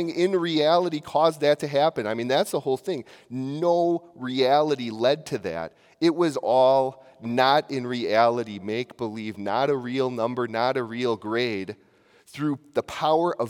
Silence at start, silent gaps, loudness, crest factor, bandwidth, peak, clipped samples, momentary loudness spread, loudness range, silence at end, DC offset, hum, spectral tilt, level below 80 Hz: 0 s; none; -24 LUFS; 20 dB; 17.5 kHz; -4 dBFS; under 0.1%; 11 LU; 4 LU; 0 s; under 0.1%; none; -5.5 dB/octave; -70 dBFS